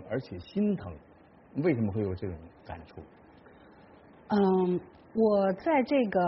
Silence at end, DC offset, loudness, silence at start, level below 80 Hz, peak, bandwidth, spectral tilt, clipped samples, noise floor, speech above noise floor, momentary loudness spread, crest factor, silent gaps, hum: 0 s; under 0.1%; -29 LUFS; 0 s; -60 dBFS; -14 dBFS; 5.8 kHz; -7 dB/octave; under 0.1%; -55 dBFS; 26 dB; 20 LU; 16 dB; none; none